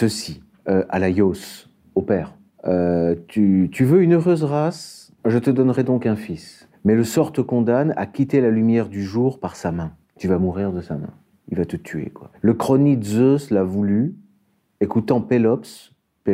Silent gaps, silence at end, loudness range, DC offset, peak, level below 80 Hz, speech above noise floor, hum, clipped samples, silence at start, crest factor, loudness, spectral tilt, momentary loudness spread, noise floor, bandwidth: none; 0 s; 4 LU; under 0.1%; -2 dBFS; -52 dBFS; 44 dB; none; under 0.1%; 0 s; 16 dB; -20 LUFS; -7.5 dB/octave; 14 LU; -63 dBFS; 16 kHz